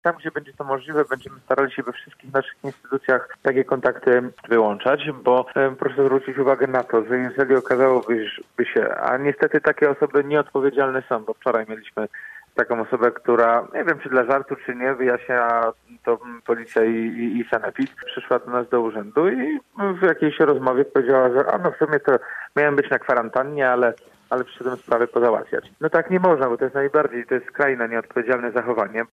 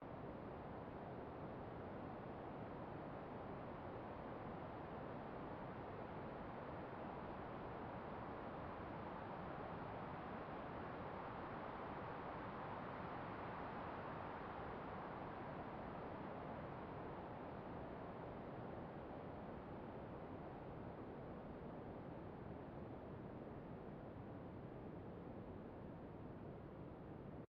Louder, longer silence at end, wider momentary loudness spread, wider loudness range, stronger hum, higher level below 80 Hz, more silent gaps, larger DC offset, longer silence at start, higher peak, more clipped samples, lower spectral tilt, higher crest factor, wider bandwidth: first, -21 LUFS vs -52 LUFS; about the same, 0.1 s vs 0.05 s; first, 9 LU vs 4 LU; about the same, 3 LU vs 4 LU; neither; about the same, -68 dBFS vs -66 dBFS; neither; neither; about the same, 0.05 s vs 0 s; first, -4 dBFS vs -38 dBFS; neither; about the same, -7.5 dB/octave vs -6.5 dB/octave; about the same, 16 dB vs 14 dB; first, 7.8 kHz vs 6 kHz